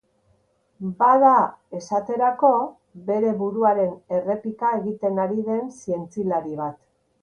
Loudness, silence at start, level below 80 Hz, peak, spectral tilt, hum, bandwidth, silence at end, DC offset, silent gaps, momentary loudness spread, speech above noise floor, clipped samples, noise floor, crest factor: -22 LUFS; 0.8 s; -68 dBFS; -4 dBFS; -8 dB/octave; none; 10 kHz; 0.45 s; under 0.1%; none; 14 LU; 43 dB; under 0.1%; -64 dBFS; 18 dB